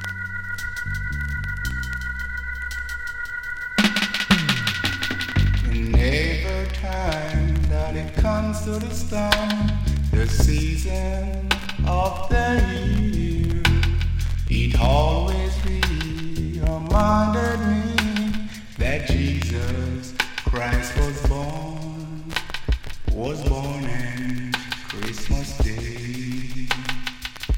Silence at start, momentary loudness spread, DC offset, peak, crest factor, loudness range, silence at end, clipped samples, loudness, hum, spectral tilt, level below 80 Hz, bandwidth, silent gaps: 0 s; 9 LU; under 0.1%; 0 dBFS; 22 dB; 6 LU; 0 s; under 0.1%; -24 LUFS; none; -5.5 dB/octave; -26 dBFS; 16.5 kHz; none